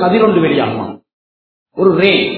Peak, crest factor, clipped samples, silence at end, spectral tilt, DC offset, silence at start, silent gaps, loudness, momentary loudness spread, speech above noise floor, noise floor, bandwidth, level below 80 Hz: 0 dBFS; 14 dB; under 0.1%; 0 s; -9 dB/octave; under 0.1%; 0 s; 1.13-1.66 s; -12 LUFS; 15 LU; over 78 dB; under -90 dBFS; 5.4 kHz; -54 dBFS